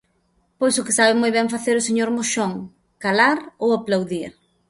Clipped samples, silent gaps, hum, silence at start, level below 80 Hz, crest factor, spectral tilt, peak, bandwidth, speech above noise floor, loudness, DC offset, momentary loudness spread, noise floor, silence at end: under 0.1%; none; none; 0.6 s; -62 dBFS; 18 dB; -3 dB/octave; -2 dBFS; 11.5 kHz; 45 dB; -20 LUFS; under 0.1%; 12 LU; -65 dBFS; 0.4 s